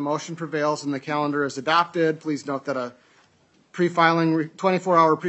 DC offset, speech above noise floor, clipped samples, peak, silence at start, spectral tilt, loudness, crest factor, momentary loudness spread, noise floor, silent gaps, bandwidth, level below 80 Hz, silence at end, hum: under 0.1%; 38 dB; under 0.1%; -4 dBFS; 0 s; -5.5 dB/octave; -23 LUFS; 18 dB; 10 LU; -60 dBFS; none; 8.4 kHz; -78 dBFS; 0 s; none